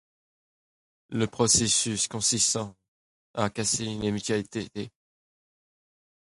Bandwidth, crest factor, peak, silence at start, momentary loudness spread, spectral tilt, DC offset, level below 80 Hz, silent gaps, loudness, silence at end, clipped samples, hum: 11.5 kHz; 22 dB; -8 dBFS; 1.1 s; 16 LU; -3 dB/octave; under 0.1%; -56 dBFS; 2.88-3.34 s; -25 LUFS; 1.4 s; under 0.1%; none